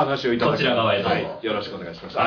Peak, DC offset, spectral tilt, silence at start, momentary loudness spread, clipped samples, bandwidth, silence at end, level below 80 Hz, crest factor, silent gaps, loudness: -8 dBFS; under 0.1%; -6.5 dB/octave; 0 s; 11 LU; under 0.1%; 5.4 kHz; 0 s; -56 dBFS; 14 dB; none; -22 LUFS